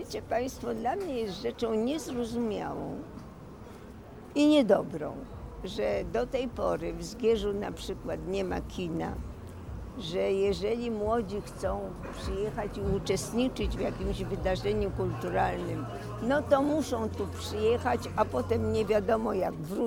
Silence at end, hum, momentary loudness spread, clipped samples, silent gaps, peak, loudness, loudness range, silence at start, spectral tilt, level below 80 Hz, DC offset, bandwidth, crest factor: 0 s; none; 13 LU; under 0.1%; none; -12 dBFS; -31 LUFS; 4 LU; 0 s; -6 dB/octave; -46 dBFS; under 0.1%; 18.5 kHz; 20 dB